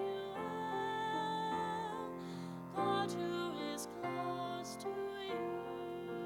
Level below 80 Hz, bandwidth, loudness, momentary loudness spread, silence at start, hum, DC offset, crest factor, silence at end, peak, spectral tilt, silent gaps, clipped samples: -74 dBFS; 18.5 kHz; -41 LUFS; 7 LU; 0 s; none; under 0.1%; 16 dB; 0 s; -24 dBFS; -5 dB/octave; none; under 0.1%